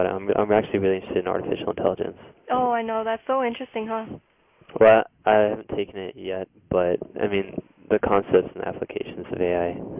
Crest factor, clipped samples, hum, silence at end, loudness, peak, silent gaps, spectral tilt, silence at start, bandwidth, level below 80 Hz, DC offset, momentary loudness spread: 18 dB; under 0.1%; none; 0 s; -24 LUFS; -6 dBFS; none; -10 dB/octave; 0 s; 3.8 kHz; -52 dBFS; under 0.1%; 13 LU